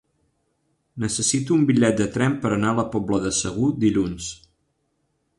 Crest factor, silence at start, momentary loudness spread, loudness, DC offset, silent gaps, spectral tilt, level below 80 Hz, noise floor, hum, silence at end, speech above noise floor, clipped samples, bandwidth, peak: 16 dB; 0.95 s; 10 LU; -21 LUFS; under 0.1%; none; -5 dB/octave; -50 dBFS; -71 dBFS; none; 1.05 s; 50 dB; under 0.1%; 11.5 kHz; -6 dBFS